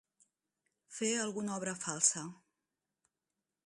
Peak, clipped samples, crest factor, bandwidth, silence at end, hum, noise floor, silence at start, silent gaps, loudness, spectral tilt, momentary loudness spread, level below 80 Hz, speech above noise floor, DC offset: -14 dBFS; under 0.1%; 26 dB; 11.5 kHz; 1.35 s; none; -90 dBFS; 0.9 s; none; -34 LUFS; -2.5 dB/octave; 15 LU; -82 dBFS; 54 dB; under 0.1%